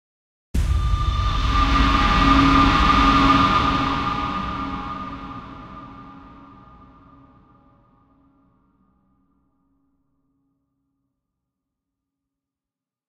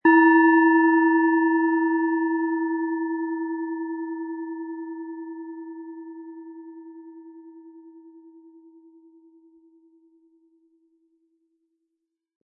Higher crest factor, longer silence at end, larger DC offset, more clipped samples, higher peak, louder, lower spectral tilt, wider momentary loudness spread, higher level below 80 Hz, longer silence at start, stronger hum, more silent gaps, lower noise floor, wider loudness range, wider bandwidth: about the same, 20 dB vs 18 dB; first, 6.95 s vs 4.35 s; neither; neither; about the same, -4 dBFS vs -6 dBFS; about the same, -19 LUFS vs -21 LUFS; second, -5.5 dB/octave vs -8 dB/octave; second, 21 LU vs 25 LU; first, -28 dBFS vs under -90 dBFS; first, 0.55 s vs 0.05 s; neither; neither; first, -90 dBFS vs -82 dBFS; second, 19 LU vs 25 LU; first, 10.5 kHz vs 2.9 kHz